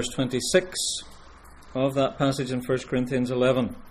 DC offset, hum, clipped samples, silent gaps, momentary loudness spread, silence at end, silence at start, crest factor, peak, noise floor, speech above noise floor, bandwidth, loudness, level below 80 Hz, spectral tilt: under 0.1%; none; under 0.1%; none; 5 LU; 0 s; 0 s; 20 dB; -6 dBFS; -47 dBFS; 22 dB; 15.5 kHz; -25 LUFS; -50 dBFS; -4.5 dB/octave